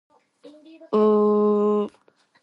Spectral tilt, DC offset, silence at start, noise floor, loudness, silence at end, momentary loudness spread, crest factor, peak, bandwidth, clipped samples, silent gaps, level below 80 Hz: -9.5 dB/octave; under 0.1%; 0.45 s; -60 dBFS; -21 LUFS; 0.55 s; 8 LU; 12 dB; -10 dBFS; 5.4 kHz; under 0.1%; none; -74 dBFS